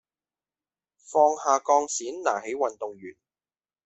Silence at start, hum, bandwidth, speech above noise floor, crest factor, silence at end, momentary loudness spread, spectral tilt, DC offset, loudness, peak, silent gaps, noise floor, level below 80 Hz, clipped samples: 1.1 s; none; 8.4 kHz; over 65 dB; 20 dB; 0.75 s; 15 LU; -2 dB/octave; under 0.1%; -25 LUFS; -6 dBFS; none; under -90 dBFS; -78 dBFS; under 0.1%